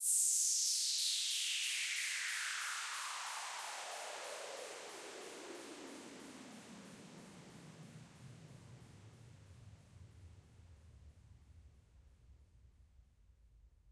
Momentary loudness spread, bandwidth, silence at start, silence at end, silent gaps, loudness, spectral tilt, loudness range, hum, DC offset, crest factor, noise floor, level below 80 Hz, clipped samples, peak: 27 LU; 13.5 kHz; 0 s; 0 s; none; -37 LUFS; 0.5 dB/octave; 25 LU; none; under 0.1%; 22 dB; -67 dBFS; -70 dBFS; under 0.1%; -22 dBFS